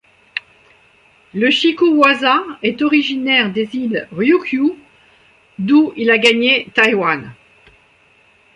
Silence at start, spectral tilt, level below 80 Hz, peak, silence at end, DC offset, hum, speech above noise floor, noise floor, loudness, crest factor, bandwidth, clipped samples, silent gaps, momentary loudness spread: 0.35 s; -4.5 dB/octave; -60 dBFS; -2 dBFS; 1.2 s; under 0.1%; none; 38 dB; -52 dBFS; -14 LUFS; 16 dB; 11 kHz; under 0.1%; none; 12 LU